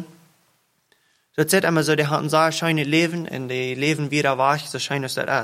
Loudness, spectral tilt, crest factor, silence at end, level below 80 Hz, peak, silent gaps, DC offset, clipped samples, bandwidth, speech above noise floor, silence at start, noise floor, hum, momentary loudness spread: -21 LUFS; -4.5 dB/octave; 20 dB; 0 s; -66 dBFS; -4 dBFS; none; under 0.1%; under 0.1%; 16 kHz; 44 dB; 0 s; -65 dBFS; none; 7 LU